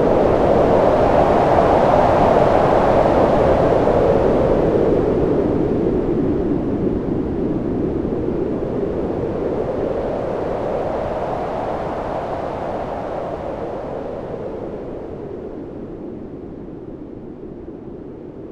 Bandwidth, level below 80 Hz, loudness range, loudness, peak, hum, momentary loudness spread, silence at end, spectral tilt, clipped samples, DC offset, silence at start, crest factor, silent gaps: 11 kHz; -34 dBFS; 16 LU; -18 LUFS; -2 dBFS; none; 19 LU; 0 s; -8.5 dB/octave; under 0.1%; under 0.1%; 0 s; 16 dB; none